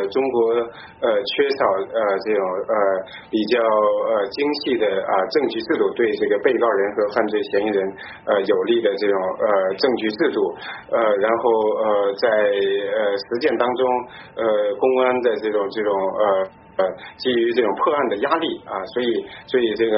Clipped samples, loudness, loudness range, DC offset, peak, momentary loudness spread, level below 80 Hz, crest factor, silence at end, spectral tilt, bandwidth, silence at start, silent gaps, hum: under 0.1%; -20 LUFS; 1 LU; under 0.1%; -4 dBFS; 6 LU; -62 dBFS; 16 dB; 0 s; -2.5 dB/octave; 5.8 kHz; 0 s; none; none